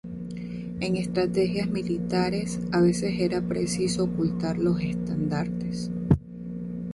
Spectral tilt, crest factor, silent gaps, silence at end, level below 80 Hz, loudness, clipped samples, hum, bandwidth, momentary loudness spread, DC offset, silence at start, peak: -6.5 dB/octave; 18 dB; none; 0 s; -46 dBFS; -27 LUFS; under 0.1%; none; 11.5 kHz; 11 LU; under 0.1%; 0.05 s; -8 dBFS